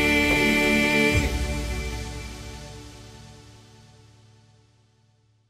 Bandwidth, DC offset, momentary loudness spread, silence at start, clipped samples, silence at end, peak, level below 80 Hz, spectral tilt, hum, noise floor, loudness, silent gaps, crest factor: 15.5 kHz; under 0.1%; 23 LU; 0 s; under 0.1%; 2.1 s; -10 dBFS; -36 dBFS; -4.5 dB/octave; none; -63 dBFS; -22 LUFS; none; 18 dB